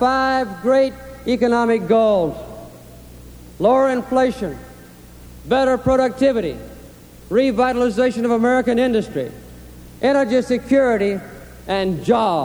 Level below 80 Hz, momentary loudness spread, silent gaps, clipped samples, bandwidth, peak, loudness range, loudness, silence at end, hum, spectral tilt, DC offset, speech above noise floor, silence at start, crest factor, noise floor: -44 dBFS; 15 LU; none; under 0.1%; over 20 kHz; -4 dBFS; 2 LU; -18 LUFS; 0 s; 60 Hz at -45 dBFS; -6 dB/octave; under 0.1%; 24 dB; 0 s; 16 dB; -41 dBFS